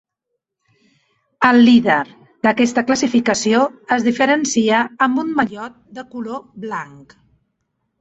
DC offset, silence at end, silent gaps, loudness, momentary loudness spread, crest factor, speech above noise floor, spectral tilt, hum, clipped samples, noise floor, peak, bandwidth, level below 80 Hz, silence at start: under 0.1%; 1.15 s; none; -16 LUFS; 18 LU; 16 dB; 61 dB; -4 dB/octave; none; under 0.1%; -77 dBFS; -2 dBFS; 8 kHz; -60 dBFS; 1.4 s